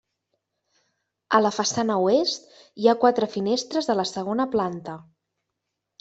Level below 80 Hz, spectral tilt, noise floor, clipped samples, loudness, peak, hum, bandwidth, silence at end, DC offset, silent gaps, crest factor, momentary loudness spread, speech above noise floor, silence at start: -66 dBFS; -4 dB/octave; -82 dBFS; under 0.1%; -23 LUFS; -4 dBFS; none; 8.2 kHz; 1 s; under 0.1%; none; 22 dB; 10 LU; 59 dB; 1.3 s